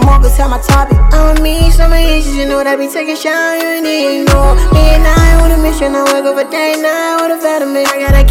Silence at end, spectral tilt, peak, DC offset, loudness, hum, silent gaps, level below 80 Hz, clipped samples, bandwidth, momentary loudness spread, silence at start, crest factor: 0 s; -5.5 dB/octave; 0 dBFS; under 0.1%; -11 LUFS; none; none; -10 dBFS; 2%; 16.5 kHz; 5 LU; 0 s; 8 dB